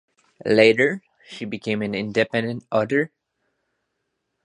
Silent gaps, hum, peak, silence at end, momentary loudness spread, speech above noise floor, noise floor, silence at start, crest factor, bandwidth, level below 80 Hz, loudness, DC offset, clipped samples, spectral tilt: none; none; 0 dBFS; 1.4 s; 17 LU; 56 dB; -77 dBFS; 0.45 s; 22 dB; 10.5 kHz; -64 dBFS; -21 LUFS; under 0.1%; under 0.1%; -6 dB/octave